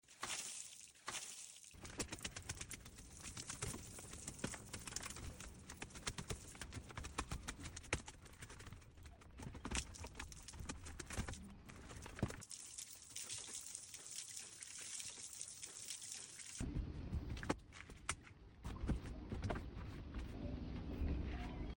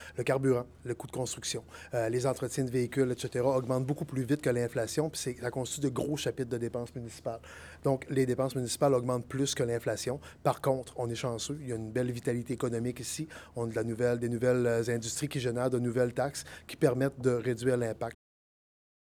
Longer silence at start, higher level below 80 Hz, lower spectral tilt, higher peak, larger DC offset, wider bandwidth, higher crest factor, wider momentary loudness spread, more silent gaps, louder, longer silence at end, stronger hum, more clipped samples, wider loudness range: about the same, 0.05 s vs 0 s; first, -54 dBFS vs -60 dBFS; second, -3.5 dB/octave vs -5.5 dB/octave; second, -22 dBFS vs -12 dBFS; neither; about the same, 17 kHz vs 18.5 kHz; first, 28 dB vs 20 dB; about the same, 10 LU vs 9 LU; neither; second, -49 LUFS vs -32 LUFS; second, 0 s vs 1 s; neither; neither; about the same, 2 LU vs 3 LU